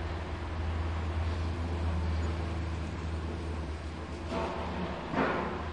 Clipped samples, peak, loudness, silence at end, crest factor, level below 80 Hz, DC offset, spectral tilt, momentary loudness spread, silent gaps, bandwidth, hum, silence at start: under 0.1%; -16 dBFS; -35 LUFS; 0 s; 18 dB; -42 dBFS; 0.2%; -7 dB/octave; 6 LU; none; 9.6 kHz; none; 0 s